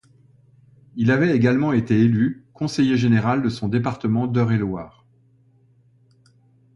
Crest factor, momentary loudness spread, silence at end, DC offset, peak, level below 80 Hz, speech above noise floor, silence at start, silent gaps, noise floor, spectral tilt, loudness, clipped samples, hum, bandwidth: 16 dB; 10 LU; 1.85 s; under 0.1%; -4 dBFS; -54 dBFS; 38 dB; 0.95 s; none; -57 dBFS; -8 dB/octave; -20 LUFS; under 0.1%; none; 11 kHz